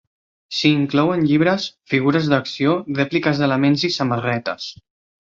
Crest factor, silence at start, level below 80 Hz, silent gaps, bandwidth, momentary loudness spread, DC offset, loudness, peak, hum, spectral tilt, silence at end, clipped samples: 18 dB; 0.5 s; -58 dBFS; none; 7.6 kHz; 7 LU; under 0.1%; -19 LUFS; -2 dBFS; none; -6 dB/octave; 0.5 s; under 0.1%